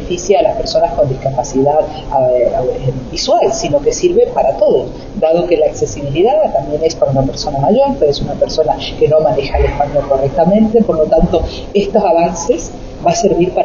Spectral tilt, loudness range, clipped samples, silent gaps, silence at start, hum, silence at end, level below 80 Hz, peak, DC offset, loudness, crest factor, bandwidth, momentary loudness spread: -5.5 dB/octave; 1 LU; under 0.1%; none; 0 s; none; 0 s; -28 dBFS; 0 dBFS; under 0.1%; -13 LUFS; 12 dB; 7.4 kHz; 6 LU